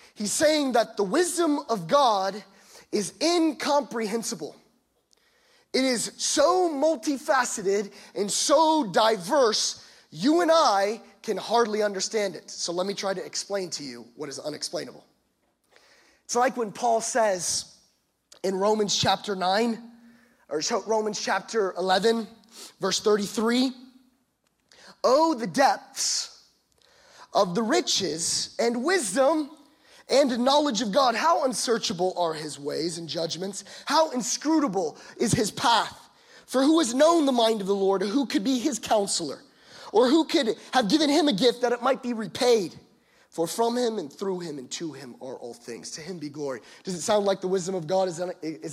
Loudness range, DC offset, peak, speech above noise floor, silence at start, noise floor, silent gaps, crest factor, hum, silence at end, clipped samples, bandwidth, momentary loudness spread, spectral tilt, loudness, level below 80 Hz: 7 LU; under 0.1%; -8 dBFS; 47 dB; 0.2 s; -71 dBFS; none; 18 dB; none; 0 s; under 0.1%; 15.5 kHz; 13 LU; -3 dB/octave; -25 LUFS; -70 dBFS